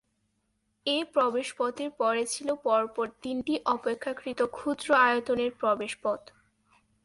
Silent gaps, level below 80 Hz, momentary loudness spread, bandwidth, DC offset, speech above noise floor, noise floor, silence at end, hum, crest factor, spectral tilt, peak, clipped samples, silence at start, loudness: none; -68 dBFS; 9 LU; 11.5 kHz; under 0.1%; 47 dB; -76 dBFS; 0.85 s; none; 20 dB; -2.5 dB/octave; -10 dBFS; under 0.1%; 0.85 s; -28 LUFS